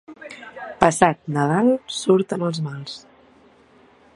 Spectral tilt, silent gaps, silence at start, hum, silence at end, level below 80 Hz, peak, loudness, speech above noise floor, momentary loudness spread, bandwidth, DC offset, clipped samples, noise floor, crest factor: -5.5 dB/octave; none; 0.1 s; none; 1.15 s; -54 dBFS; 0 dBFS; -20 LUFS; 33 dB; 20 LU; 11.5 kHz; under 0.1%; under 0.1%; -53 dBFS; 22 dB